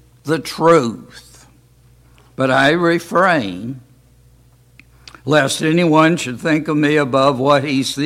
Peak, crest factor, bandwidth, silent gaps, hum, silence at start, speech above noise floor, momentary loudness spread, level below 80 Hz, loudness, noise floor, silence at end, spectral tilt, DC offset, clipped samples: 0 dBFS; 16 dB; 15.5 kHz; none; none; 0.25 s; 35 dB; 12 LU; -54 dBFS; -15 LUFS; -50 dBFS; 0 s; -5 dB/octave; under 0.1%; under 0.1%